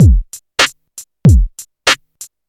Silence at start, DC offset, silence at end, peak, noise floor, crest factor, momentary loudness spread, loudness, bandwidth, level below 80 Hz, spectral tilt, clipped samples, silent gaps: 0 s; under 0.1%; 0.25 s; 0 dBFS; -38 dBFS; 12 dB; 23 LU; -14 LUFS; 16 kHz; -16 dBFS; -4.5 dB/octave; under 0.1%; none